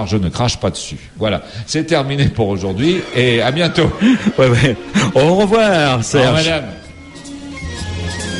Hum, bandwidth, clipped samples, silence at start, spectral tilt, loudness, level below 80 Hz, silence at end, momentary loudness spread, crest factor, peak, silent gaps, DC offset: none; 11.5 kHz; under 0.1%; 0 s; -5.5 dB/octave; -15 LUFS; -36 dBFS; 0 s; 16 LU; 14 dB; 0 dBFS; none; under 0.1%